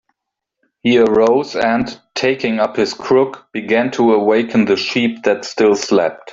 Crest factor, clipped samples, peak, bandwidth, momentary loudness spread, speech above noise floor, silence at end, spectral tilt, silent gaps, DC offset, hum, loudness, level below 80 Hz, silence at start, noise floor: 14 dB; under 0.1%; 0 dBFS; 7.8 kHz; 7 LU; 64 dB; 0 s; -5 dB/octave; none; under 0.1%; none; -15 LUFS; -54 dBFS; 0.85 s; -79 dBFS